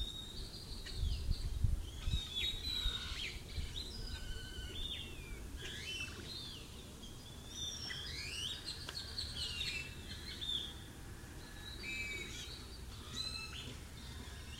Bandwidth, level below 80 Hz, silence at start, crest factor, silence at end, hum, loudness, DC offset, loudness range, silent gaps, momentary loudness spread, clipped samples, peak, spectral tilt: 16 kHz; -46 dBFS; 0 s; 24 dB; 0 s; none; -43 LUFS; under 0.1%; 5 LU; none; 12 LU; under 0.1%; -20 dBFS; -3 dB/octave